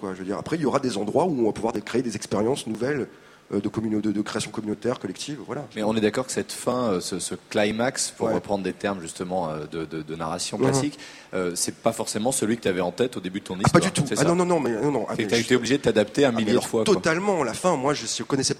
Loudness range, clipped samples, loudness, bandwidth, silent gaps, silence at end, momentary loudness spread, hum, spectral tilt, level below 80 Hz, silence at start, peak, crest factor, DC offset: 5 LU; under 0.1%; -25 LUFS; 16 kHz; none; 0 s; 9 LU; none; -4.5 dB/octave; -56 dBFS; 0 s; 0 dBFS; 24 dB; under 0.1%